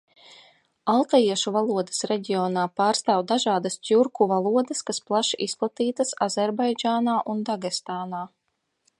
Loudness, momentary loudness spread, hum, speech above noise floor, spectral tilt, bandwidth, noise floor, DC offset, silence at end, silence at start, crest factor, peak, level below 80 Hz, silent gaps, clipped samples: -24 LUFS; 8 LU; none; 52 dB; -4 dB/octave; 11.5 kHz; -76 dBFS; under 0.1%; 0.7 s; 0.85 s; 18 dB; -6 dBFS; -76 dBFS; none; under 0.1%